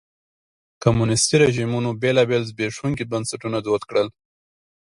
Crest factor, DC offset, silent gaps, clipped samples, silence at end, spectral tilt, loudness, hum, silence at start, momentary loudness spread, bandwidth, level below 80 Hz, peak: 22 dB; under 0.1%; none; under 0.1%; 0.8 s; -5 dB/octave; -21 LUFS; none; 0.8 s; 9 LU; 11.5 kHz; -50 dBFS; 0 dBFS